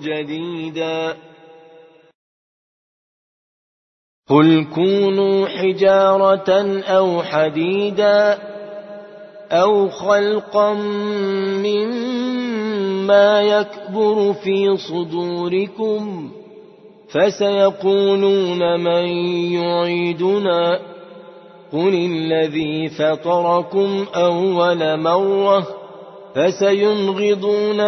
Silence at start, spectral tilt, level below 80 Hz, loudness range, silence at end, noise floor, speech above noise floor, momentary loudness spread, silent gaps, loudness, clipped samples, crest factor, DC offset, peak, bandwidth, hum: 0 s; -6.5 dB/octave; -66 dBFS; 5 LU; 0 s; -46 dBFS; 30 dB; 10 LU; 2.14-4.23 s; -17 LUFS; under 0.1%; 18 dB; under 0.1%; 0 dBFS; 6.2 kHz; none